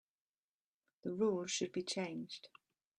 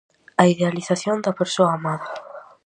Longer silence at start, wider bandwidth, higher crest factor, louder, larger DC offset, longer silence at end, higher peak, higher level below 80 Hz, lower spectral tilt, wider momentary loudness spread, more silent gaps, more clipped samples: first, 1.05 s vs 0.4 s; about the same, 11.5 kHz vs 10.5 kHz; about the same, 18 dB vs 20 dB; second, -40 LUFS vs -21 LUFS; neither; first, 0.5 s vs 0.25 s; second, -24 dBFS vs 0 dBFS; second, -84 dBFS vs -68 dBFS; second, -4 dB/octave vs -5.5 dB/octave; about the same, 13 LU vs 15 LU; neither; neither